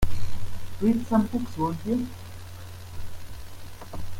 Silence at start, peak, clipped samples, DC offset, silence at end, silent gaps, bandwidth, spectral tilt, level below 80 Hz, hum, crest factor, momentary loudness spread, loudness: 0 s; -10 dBFS; under 0.1%; under 0.1%; 0 s; none; 16.5 kHz; -7 dB/octave; -38 dBFS; none; 16 dB; 19 LU; -28 LUFS